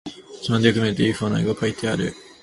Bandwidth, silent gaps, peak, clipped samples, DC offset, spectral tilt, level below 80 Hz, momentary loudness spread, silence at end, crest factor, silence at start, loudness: 11.5 kHz; none; -2 dBFS; under 0.1%; under 0.1%; -6 dB/octave; -50 dBFS; 11 LU; 0.2 s; 20 dB; 0.05 s; -22 LUFS